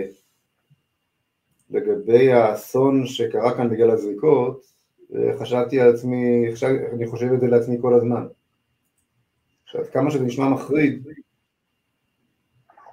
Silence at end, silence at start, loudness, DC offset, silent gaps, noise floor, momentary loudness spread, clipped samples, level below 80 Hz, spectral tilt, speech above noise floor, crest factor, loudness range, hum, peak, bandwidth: 1.7 s; 0 s; -20 LUFS; under 0.1%; none; -74 dBFS; 11 LU; under 0.1%; -66 dBFS; -7.5 dB/octave; 55 dB; 20 dB; 6 LU; none; -2 dBFS; 15.5 kHz